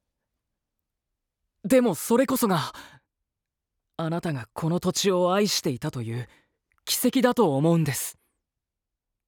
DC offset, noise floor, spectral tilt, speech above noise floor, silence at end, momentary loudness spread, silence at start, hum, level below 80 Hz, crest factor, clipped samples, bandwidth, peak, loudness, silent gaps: under 0.1%; -86 dBFS; -5 dB/octave; 62 dB; 1.15 s; 13 LU; 1.65 s; none; -64 dBFS; 20 dB; under 0.1%; over 20 kHz; -6 dBFS; -24 LUFS; none